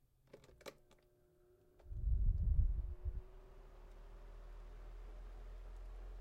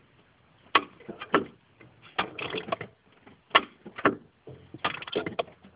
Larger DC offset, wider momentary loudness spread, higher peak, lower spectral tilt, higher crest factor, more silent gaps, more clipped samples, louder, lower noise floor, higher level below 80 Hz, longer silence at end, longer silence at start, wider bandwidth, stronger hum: neither; first, 23 LU vs 19 LU; second, -22 dBFS vs -2 dBFS; first, -7.5 dB/octave vs -1 dB/octave; second, 20 dB vs 30 dB; neither; neither; second, -44 LUFS vs -29 LUFS; first, -71 dBFS vs -61 dBFS; first, -44 dBFS vs -64 dBFS; about the same, 0 s vs 0.1 s; second, 0.35 s vs 0.75 s; first, 8 kHz vs 4 kHz; neither